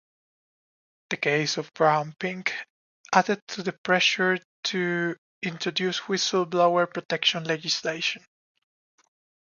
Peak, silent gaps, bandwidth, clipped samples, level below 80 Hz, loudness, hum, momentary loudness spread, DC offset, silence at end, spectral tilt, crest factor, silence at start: -2 dBFS; 2.70-3.04 s, 3.42-3.47 s, 3.78-3.84 s, 4.45-4.63 s, 5.18-5.41 s, 7.05-7.09 s; 7.4 kHz; under 0.1%; -76 dBFS; -25 LUFS; none; 10 LU; under 0.1%; 1.3 s; -3.5 dB/octave; 24 dB; 1.1 s